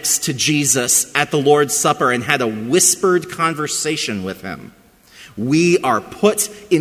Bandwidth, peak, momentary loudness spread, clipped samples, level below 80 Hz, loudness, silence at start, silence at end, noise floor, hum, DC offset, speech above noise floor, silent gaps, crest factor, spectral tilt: 16 kHz; 0 dBFS; 12 LU; under 0.1%; -54 dBFS; -16 LUFS; 0 s; 0 s; -44 dBFS; none; under 0.1%; 27 dB; none; 16 dB; -3 dB/octave